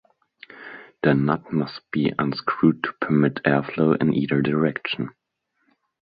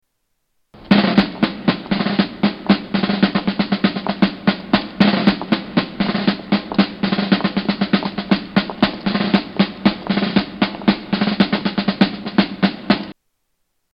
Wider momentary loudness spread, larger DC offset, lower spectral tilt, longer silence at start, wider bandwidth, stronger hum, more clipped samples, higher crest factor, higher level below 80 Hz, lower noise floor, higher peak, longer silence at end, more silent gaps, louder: first, 11 LU vs 4 LU; neither; first, -10.5 dB/octave vs -8 dB/octave; second, 0.5 s vs 0.75 s; second, 5 kHz vs 5.8 kHz; neither; neither; about the same, 20 dB vs 18 dB; second, -60 dBFS vs -48 dBFS; about the same, -71 dBFS vs -70 dBFS; second, -4 dBFS vs 0 dBFS; first, 1.05 s vs 0.8 s; neither; second, -22 LUFS vs -18 LUFS